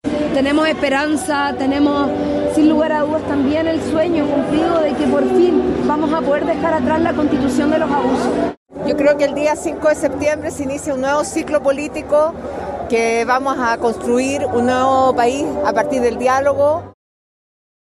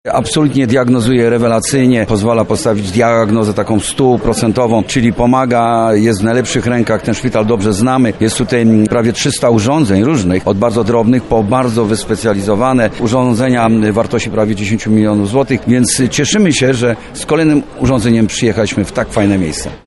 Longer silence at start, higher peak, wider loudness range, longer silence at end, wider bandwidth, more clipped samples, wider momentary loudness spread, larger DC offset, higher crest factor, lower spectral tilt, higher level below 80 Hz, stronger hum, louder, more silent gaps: about the same, 0.05 s vs 0.05 s; second, -4 dBFS vs 0 dBFS; about the same, 2 LU vs 1 LU; first, 0.95 s vs 0.1 s; about the same, 12.5 kHz vs 11.5 kHz; neither; about the same, 5 LU vs 4 LU; neither; about the same, 14 dB vs 12 dB; about the same, -5 dB/octave vs -5.5 dB/octave; second, -42 dBFS vs -34 dBFS; neither; second, -16 LUFS vs -12 LUFS; first, 8.57-8.66 s vs none